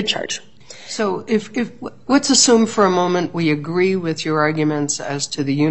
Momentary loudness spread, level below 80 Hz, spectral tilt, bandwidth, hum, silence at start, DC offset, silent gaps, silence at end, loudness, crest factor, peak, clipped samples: 14 LU; -60 dBFS; -3.5 dB/octave; 8.6 kHz; none; 0 s; 0.7%; none; 0 s; -18 LUFS; 18 dB; 0 dBFS; under 0.1%